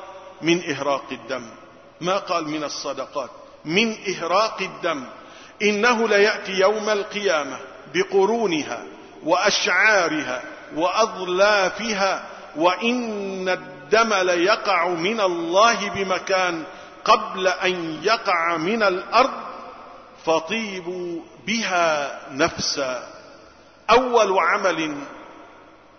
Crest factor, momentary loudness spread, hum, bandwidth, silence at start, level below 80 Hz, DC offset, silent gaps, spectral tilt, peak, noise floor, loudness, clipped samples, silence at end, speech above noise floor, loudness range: 18 dB; 15 LU; none; 6.6 kHz; 0 s; -58 dBFS; under 0.1%; none; -3 dB/octave; -4 dBFS; -49 dBFS; -21 LUFS; under 0.1%; 0.5 s; 28 dB; 5 LU